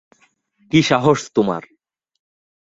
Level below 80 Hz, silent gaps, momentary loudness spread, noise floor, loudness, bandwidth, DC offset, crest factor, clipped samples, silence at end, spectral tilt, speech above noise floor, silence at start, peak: -54 dBFS; none; 7 LU; -60 dBFS; -17 LUFS; 8 kHz; under 0.1%; 20 dB; under 0.1%; 1 s; -5.5 dB/octave; 44 dB; 0.75 s; -2 dBFS